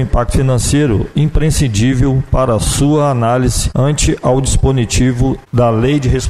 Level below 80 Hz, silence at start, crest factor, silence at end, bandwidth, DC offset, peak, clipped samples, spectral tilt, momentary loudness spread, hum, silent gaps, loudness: -20 dBFS; 0 s; 12 dB; 0 s; 14 kHz; 1%; 0 dBFS; under 0.1%; -5.5 dB/octave; 2 LU; none; none; -13 LUFS